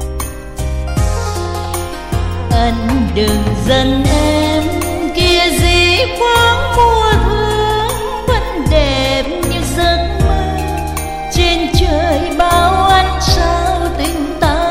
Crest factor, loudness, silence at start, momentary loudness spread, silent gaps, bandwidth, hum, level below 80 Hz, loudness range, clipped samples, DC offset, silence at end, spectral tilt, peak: 12 dB; -13 LUFS; 0 s; 9 LU; none; 16.5 kHz; none; -20 dBFS; 4 LU; under 0.1%; under 0.1%; 0 s; -5 dB/octave; 0 dBFS